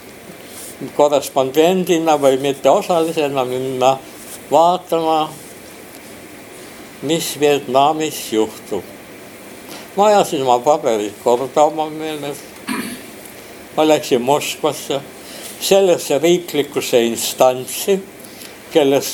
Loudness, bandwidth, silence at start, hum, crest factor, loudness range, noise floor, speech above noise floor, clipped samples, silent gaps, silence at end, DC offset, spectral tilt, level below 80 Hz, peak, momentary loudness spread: -16 LUFS; over 20 kHz; 0 s; none; 18 dB; 4 LU; -36 dBFS; 21 dB; under 0.1%; none; 0 s; under 0.1%; -4 dB/octave; -60 dBFS; 0 dBFS; 21 LU